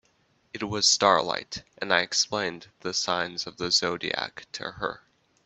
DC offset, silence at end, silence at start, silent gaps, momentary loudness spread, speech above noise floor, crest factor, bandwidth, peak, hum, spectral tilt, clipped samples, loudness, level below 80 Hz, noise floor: under 0.1%; 0.5 s; 0.55 s; none; 15 LU; 40 dB; 26 dB; 8.6 kHz; -4 dBFS; none; -1.5 dB/octave; under 0.1%; -26 LUFS; -64 dBFS; -67 dBFS